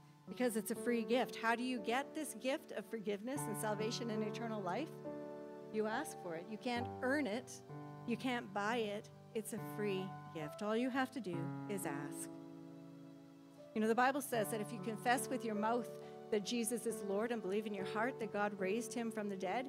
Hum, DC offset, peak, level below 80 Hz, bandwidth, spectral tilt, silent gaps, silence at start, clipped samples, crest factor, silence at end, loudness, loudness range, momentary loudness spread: none; under 0.1%; -20 dBFS; -86 dBFS; 16 kHz; -4.5 dB/octave; none; 0 s; under 0.1%; 20 dB; 0 s; -40 LUFS; 4 LU; 12 LU